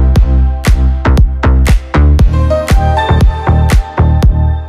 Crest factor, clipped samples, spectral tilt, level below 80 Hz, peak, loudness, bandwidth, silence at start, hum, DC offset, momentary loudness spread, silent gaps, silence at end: 8 dB; under 0.1%; -7 dB/octave; -10 dBFS; 0 dBFS; -10 LUFS; 13.5 kHz; 0 s; none; under 0.1%; 2 LU; none; 0 s